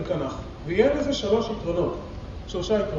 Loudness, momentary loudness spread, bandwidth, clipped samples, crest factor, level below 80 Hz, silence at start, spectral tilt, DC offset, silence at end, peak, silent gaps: -26 LUFS; 14 LU; 7.6 kHz; under 0.1%; 18 dB; -40 dBFS; 0 s; -6 dB/octave; under 0.1%; 0 s; -6 dBFS; none